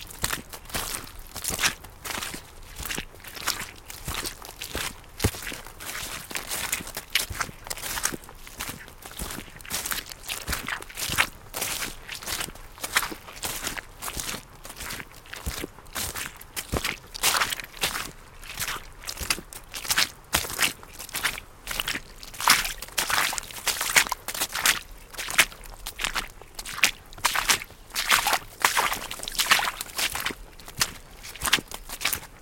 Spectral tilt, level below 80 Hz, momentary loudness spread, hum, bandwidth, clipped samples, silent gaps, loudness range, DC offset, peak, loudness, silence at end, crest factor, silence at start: -0.5 dB/octave; -46 dBFS; 16 LU; none; 17 kHz; under 0.1%; none; 8 LU; under 0.1%; 0 dBFS; -27 LUFS; 0 s; 30 dB; 0 s